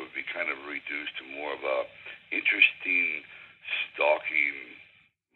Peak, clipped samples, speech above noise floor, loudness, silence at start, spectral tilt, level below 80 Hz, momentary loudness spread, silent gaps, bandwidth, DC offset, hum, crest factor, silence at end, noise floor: -6 dBFS; under 0.1%; 34 dB; -27 LUFS; 0 s; -4.5 dB/octave; -78 dBFS; 19 LU; none; 4.6 kHz; under 0.1%; none; 24 dB; 0.55 s; -62 dBFS